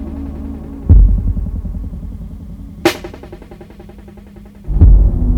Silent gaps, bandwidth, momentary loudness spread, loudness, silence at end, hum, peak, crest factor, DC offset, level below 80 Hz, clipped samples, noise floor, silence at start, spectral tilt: none; 12.5 kHz; 26 LU; -15 LUFS; 0 s; none; 0 dBFS; 14 dB; under 0.1%; -16 dBFS; 0.5%; -36 dBFS; 0 s; -7 dB/octave